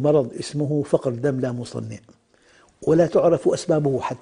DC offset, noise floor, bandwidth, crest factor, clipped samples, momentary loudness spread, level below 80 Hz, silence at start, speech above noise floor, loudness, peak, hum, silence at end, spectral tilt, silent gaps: under 0.1%; -56 dBFS; 10 kHz; 18 dB; under 0.1%; 14 LU; -56 dBFS; 0 s; 35 dB; -22 LUFS; -4 dBFS; none; 0.05 s; -7 dB/octave; none